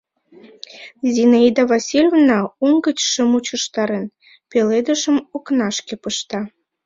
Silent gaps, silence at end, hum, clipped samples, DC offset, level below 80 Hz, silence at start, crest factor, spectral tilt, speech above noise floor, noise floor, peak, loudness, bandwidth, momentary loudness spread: none; 0.4 s; none; under 0.1%; under 0.1%; -62 dBFS; 0.75 s; 16 dB; -3.5 dB/octave; 30 dB; -46 dBFS; -2 dBFS; -17 LUFS; 7.8 kHz; 13 LU